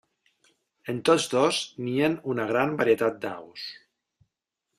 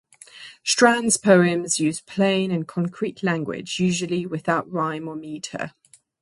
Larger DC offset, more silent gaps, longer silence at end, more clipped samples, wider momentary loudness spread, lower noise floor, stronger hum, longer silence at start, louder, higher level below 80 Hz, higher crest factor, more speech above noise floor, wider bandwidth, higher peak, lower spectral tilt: neither; neither; first, 1.05 s vs 0.5 s; neither; about the same, 15 LU vs 16 LU; first, -83 dBFS vs -44 dBFS; neither; first, 0.85 s vs 0.35 s; second, -25 LUFS vs -22 LUFS; about the same, -68 dBFS vs -64 dBFS; about the same, 20 dB vs 22 dB; first, 57 dB vs 23 dB; first, 14 kHz vs 11.5 kHz; second, -8 dBFS vs -2 dBFS; about the same, -4.5 dB/octave vs -4 dB/octave